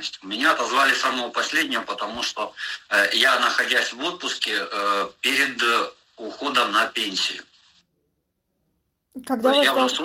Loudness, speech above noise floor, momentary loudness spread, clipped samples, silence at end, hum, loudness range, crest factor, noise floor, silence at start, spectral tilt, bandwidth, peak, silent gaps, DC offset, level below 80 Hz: -21 LUFS; 52 dB; 12 LU; under 0.1%; 0 s; none; 5 LU; 20 dB; -75 dBFS; 0 s; -1 dB/octave; 16.5 kHz; -4 dBFS; none; under 0.1%; -68 dBFS